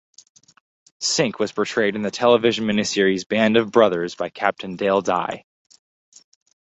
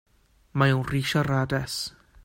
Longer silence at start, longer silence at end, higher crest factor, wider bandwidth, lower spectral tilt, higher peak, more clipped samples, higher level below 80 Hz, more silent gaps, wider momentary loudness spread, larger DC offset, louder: first, 1 s vs 0.55 s; first, 1.3 s vs 0.35 s; about the same, 20 dB vs 18 dB; second, 8.4 kHz vs 16.5 kHz; second, -4 dB/octave vs -5.5 dB/octave; first, -2 dBFS vs -8 dBFS; neither; second, -62 dBFS vs -50 dBFS; first, 3.26-3.30 s vs none; about the same, 8 LU vs 10 LU; neither; first, -20 LUFS vs -26 LUFS